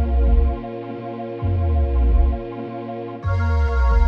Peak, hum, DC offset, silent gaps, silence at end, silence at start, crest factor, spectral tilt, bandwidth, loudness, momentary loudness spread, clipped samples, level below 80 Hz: -6 dBFS; none; under 0.1%; none; 0 s; 0 s; 12 dB; -9.5 dB/octave; 5.2 kHz; -22 LUFS; 11 LU; under 0.1%; -20 dBFS